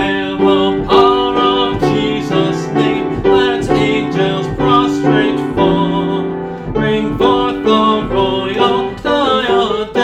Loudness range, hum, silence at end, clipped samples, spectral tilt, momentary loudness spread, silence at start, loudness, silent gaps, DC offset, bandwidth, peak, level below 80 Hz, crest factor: 1 LU; none; 0 s; under 0.1%; -6.5 dB/octave; 4 LU; 0 s; -13 LUFS; none; under 0.1%; 9.4 kHz; 0 dBFS; -36 dBFS; 12 dB